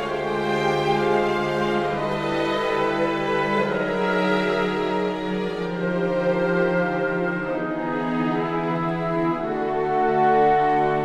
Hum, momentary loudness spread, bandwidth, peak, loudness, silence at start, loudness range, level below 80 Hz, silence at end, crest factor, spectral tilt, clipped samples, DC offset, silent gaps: none; 6 LU; 12.5 kHz; -8 dBFS; -22 LUFS; 0 s; 2 LU; -50 dBFS; 0 s; 14 dB; -6.5 dB/octave; under 0.1%; under 0.1%; none